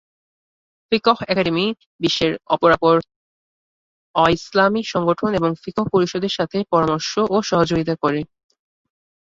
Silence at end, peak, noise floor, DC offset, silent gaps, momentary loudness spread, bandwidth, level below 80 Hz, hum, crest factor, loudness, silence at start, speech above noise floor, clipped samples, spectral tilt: 1 s; -2 dBFS; under -90 dBFS; under 0.1%; 1.86-1.99 s, 3.16-4.14 s; 6 LU; 7.8 kHz; -50 dBFS; none; 18 dB; -19 LUFS; 0.9 s; over 72 dB; under 0.1%; -5.5 dB/octave